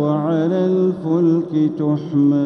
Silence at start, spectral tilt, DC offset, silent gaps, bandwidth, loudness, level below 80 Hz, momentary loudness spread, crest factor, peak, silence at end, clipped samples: 0 s; -10 dB/octave; under 0.1%; none; 6.2 kHz; -18 LUFS; -66 dBFS; 3 LU; 10 dB; -6 dBFS; 0 s; under 0.1%